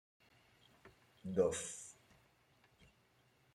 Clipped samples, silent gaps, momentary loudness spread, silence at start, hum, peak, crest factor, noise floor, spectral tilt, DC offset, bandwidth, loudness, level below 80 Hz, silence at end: under 0.1%; none; 17 LU; 0.85 s; none; -22 dBFS; 24 dB; -73 dBFS; -4.5 dB/octave; under 0.1%; 13 kHz; -40 LUFS; -76 dBFS; 1.6 s